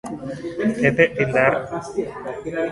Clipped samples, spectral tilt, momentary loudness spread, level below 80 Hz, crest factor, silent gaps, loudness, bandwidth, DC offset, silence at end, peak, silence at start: under 0.1%; -6.5 dB/octave; 13 LU; -52 dBFS; 20 dB; none; -21 LUFS; 11.5 kHz; under 0.1%; 0 s; 0 dBFS; 0.05 s